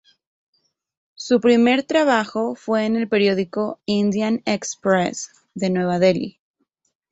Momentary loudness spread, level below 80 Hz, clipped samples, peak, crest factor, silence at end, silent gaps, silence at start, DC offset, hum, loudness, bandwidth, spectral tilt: 10 LU; -62 dBFS; under 0.1%; -4 dBFS; 18 dB; 0.8 s; none; 1.2 s; under 0.1%; none; -20 LUFS; 8.2 kHz; -5 dB/octave